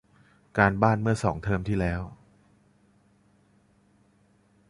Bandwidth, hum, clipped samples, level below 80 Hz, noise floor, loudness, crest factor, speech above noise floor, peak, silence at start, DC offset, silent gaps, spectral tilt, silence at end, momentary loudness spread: 11.5 kHz; none; under 0.1%; -46 dBFS; -63 dBFS; -26 LUFS; 26 dB; 39 dB; -4 dBFS; 0.55 s; under 0.1%; none; -7.5 dB/octave; 2.55 s; 12 LU